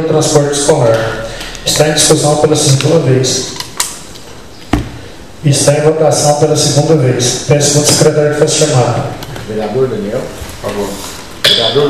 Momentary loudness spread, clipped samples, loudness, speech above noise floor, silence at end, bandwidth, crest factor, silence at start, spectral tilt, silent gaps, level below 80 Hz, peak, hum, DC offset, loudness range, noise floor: 14 LU; 0.4%; -10 LUFS; 22 dB; 0 s; 16 kHz; 12 dB; 0 s; -4 dB/octave; none; -34 dBFS; 0 dBFS; none; 2%; 4 LU; -32 dBFS